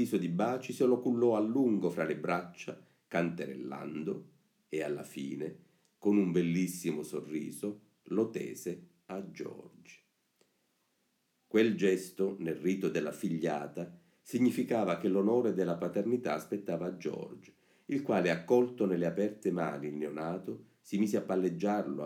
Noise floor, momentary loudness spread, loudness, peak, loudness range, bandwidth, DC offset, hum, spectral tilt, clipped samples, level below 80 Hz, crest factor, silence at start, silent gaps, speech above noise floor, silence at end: -77 dBFS; 15 LU; -33 LUFS; -14 dBFS; 7 LU; 17 kHz; under 0.1%; none; -6.5 dB/octave; under 0.1%; -80 dBFS; 18 dB; 0 s; none; 45 dB; 0 s